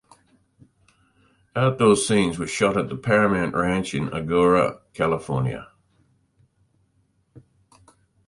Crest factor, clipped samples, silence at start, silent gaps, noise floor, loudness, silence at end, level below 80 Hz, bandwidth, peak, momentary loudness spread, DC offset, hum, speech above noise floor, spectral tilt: 20 dB; under 0.1%; 1.55 s; none; -66 dBFS; -22 LUFS; 0.9 s; -50 dBFS; 11.5 kHz; -4 dBFS; 9 LU; under 0.1%; none; 45 dB; -5.5 dB/octave